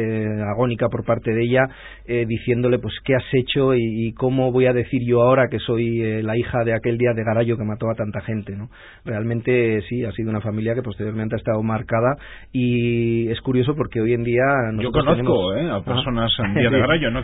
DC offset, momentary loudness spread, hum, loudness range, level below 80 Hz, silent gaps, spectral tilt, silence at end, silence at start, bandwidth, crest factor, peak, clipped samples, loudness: under 0.1%; 8 LU; none; 4 LU; -42 dBFS; none; -12 dB/octave; 0 s; 0 s; 4 kHz; 16 dB; -4 dBFS; under 0.1%; -20 LUFS